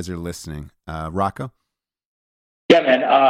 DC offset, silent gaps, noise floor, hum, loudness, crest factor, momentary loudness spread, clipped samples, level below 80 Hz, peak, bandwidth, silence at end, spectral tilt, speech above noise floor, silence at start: under 0.1%; 2.06-2.69 s; -80 dBFS; none; -19 LUFS; 20 dB; 20 LU; under 0.1%; -46 dBFS; 0 dBFS; 14.5 kHz; 0 s; -5.5 dB/octave; 61 dB; 0 s